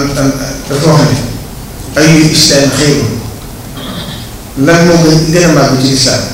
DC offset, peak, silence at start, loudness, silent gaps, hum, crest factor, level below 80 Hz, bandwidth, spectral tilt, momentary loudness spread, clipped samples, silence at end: under 0.1%; 0 dBFS; 0 s; -8 LUFS; none; none; 8 dB; -28 dBFS; 16.5 kHz; -4.5 dB/octave; 18 LU; 1%; 0 s